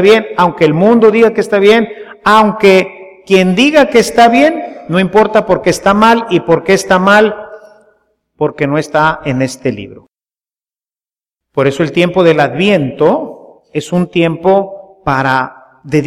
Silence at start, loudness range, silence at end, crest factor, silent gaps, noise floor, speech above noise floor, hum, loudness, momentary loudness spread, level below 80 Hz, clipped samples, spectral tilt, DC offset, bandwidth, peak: 0 s; 8 LU; 0 s; 10 dB; none; under -90 dBFS; over 81 dB; none; -10 LUFS; 11 LU; -44 dBFS; under 0.1%; -5.5 dB/octave; under 0.1%; 15.5 kHz; 0 dBFS